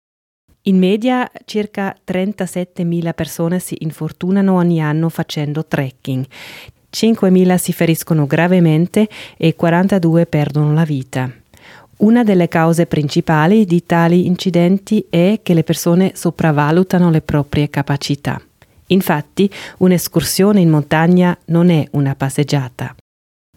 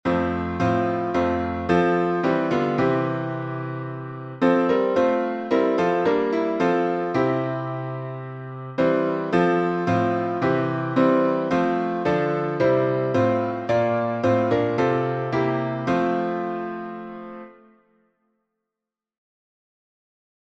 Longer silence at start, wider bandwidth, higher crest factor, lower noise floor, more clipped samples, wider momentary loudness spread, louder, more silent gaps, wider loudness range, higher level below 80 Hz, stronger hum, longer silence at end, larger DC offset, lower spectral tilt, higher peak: first, 0.65 s vs 0.05 s; first, 16.5 kHz vs 8 kHz; about the same, 14 dB vs 18 dB; second, -43 dBFS vs -88 dBFS; neither; about the same, 10 LU vs 11 LU; first, -15 LUFS vs -22 LUFS; neither; about the same, 4 LU vs 5 LU; first, -48 dBFS vs -54 dBFS; neither; second, 0.65 s vs 3 s; neither; second, -6.5 dB/octave vs -8 dB/octave; first, 0 dBFS vs -6 dBFS